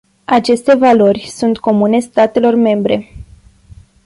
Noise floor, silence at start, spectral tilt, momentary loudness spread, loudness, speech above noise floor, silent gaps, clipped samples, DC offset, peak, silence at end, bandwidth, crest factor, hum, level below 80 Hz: -41 dBFS; 0.3 s; -6 dB/octave; 7 LU; -12 LUFS; 30 dB; none; under 0.1%; under 0.1%; -2 dBFS; 0.85 s; 11.5 kHz; 12 dB; none; -44 dBFS